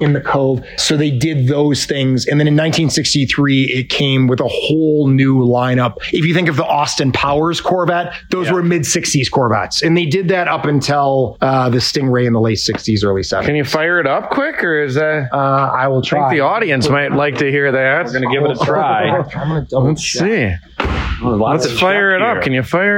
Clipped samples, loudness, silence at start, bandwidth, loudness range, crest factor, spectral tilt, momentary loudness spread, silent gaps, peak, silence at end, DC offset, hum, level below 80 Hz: under 0.1%; -14 LUFS; 0 s; 16.5 kHz; 2 LU; 10 dB; -5 dB/octave; 4 LU; none; -4 dBFS; 0 s; under 0.1%; none; -38 dBFS